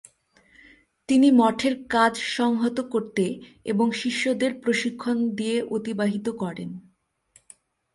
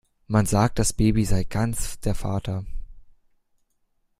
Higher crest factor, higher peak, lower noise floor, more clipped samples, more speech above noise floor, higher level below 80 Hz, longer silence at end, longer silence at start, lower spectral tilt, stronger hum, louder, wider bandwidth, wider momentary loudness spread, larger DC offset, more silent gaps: about the same, 18 dB vs 20 dB; second, -8 dBFS vs -4 dBFS; second, -61 dBFS vs -69 dBFS; neither; second, 38 dB vs 47 dB; second, -64 dBFS vs -34 dBFS; about the same, 1.15 s vs 1.15 s; first, 1.1 s vs 0.3 s; about the same, -5 dB/octave vs -5.5 dB/octave; neither; about the same, -24 LUFS vs -24 LUFS; second, 11.5 kHz vs 15.5 kHz; about the same, 11 LU vs 11 LU; neither; neither